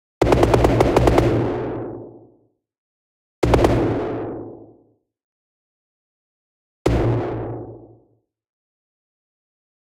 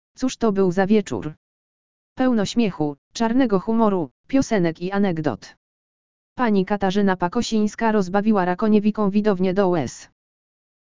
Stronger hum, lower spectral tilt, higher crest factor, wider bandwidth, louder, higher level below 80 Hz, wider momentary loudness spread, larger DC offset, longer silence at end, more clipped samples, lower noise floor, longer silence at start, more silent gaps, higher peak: neither; about the same, -7.5 dB/octave vs -6.5 dB/octave; about the same, 20 dB vs 16 dB; first, 16 kHz vs 7.6 kHz; about the same, -19 LUFS vs -21 LUFS; first, -32 dBFS vs -50 dBFS; first, 18 LU vs 8 LU; second, under 0.1% vs 2%; first, 2.05 s vs 0.7 s; neither; second, -63 dBFS vs under -90 dBFS; about the same, 0.2 s vs 0.15 s; first, 2.78-3.42 s, 5.24-6.85 s vs 1.37-2.16 s, 2.98-3.11 s, 4.11-4.24 s, 5.57-6.36 s; about the same, -2 dBFS vs -4 dBFS